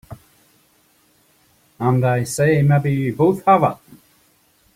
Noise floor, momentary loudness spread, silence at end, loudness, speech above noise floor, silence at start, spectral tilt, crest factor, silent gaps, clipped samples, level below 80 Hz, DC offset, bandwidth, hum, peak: -58 dBFS; 7 LU; 1 s; -17 LUFS; 42 dB; 0.1 s; -7 dB/octave; 18 dB; none; under 0.1%; -54 dBFS; under 0.1%; 15.5 kHz; none; -2 dBFS